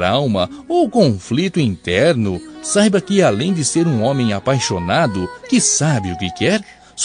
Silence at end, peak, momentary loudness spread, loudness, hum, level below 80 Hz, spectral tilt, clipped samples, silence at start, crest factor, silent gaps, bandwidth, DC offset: 0 s; 0 dBFS; 6 LU; -16 LUFS; none; -50 dBFS; -4.5 dB/octave; under 0.1%; 0 s; 16 dB; none; 10.5 kHz; under 0.1%